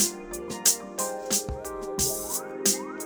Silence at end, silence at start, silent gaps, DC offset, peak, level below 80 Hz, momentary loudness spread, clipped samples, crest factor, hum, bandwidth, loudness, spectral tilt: 0 s; 0 s; none; under 0.1%; -6 dBFS; -48 dBFS; 12 LU; under 0.1%; 24 dB; none; over 20 kHz; -26 LUFS; -1.5 dB/octave